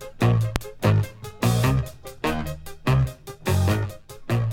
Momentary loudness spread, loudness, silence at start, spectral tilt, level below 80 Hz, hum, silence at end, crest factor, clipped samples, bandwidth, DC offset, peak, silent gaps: 11 LU; -24 LUFS; 0 s; -6.5 dB/octave; -38 dBFS; none; 0 s; 22 dB; under 0.1%; 17 kHz; under 0.1%; 0 dBFS; none